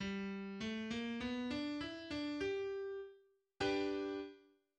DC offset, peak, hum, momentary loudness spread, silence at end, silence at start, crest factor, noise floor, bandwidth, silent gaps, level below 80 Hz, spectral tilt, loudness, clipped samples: under 0.1%; -26 dBFS; none; 8 LU; 0.35 s; 0 s; 16 dB; -68 dBFS; 9.8 kHz; none; -68 dBFS; -5.5 dB/octave; -42 LUFS; under 0.1%